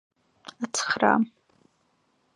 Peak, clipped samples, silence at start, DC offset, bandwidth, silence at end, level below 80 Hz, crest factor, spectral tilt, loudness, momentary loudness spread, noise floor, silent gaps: -4 dBFS; under 0.1%; 0.6 s; under 0.1%; 11.5 kHz; 1.1 s; -76 dBFS; 24 dB; -3 dB/octave; -25 LUFS; 24 LU; -69 dBFS; none